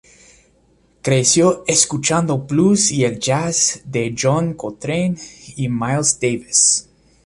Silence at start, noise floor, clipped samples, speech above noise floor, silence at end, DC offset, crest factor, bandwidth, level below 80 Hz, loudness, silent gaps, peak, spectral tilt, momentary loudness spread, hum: 1.05 s; -56 dBFS; under 0.1%; 39 dB; 0.45 s; under 0.1%; 18 dB; 11.5 kHz; -52 dBFS; -16 LUFS; none; 0 dBFS; -3.5 dB/octave; 10 LU; none